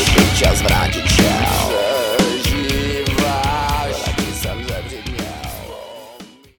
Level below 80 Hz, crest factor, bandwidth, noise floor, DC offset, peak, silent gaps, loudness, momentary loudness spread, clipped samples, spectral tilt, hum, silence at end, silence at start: -26 dBFS; 16 dB; 19.5 kHz; -40 dBFS; under 0.1%; -2 dBFS; none; -17 LUFS; 16 LU; under 0.1%; -4 dB/octave; none; 0.3 s; 0 s